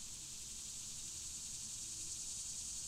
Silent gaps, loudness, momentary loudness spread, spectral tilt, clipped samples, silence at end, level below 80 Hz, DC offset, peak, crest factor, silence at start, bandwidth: none; -44 LUFS; 3 LU; 0 dB/octave; under 0.1%; 0 s; -64 dBFS; under 0.1%; -32 dBFS; 14 dB; 0 s; 16 kHz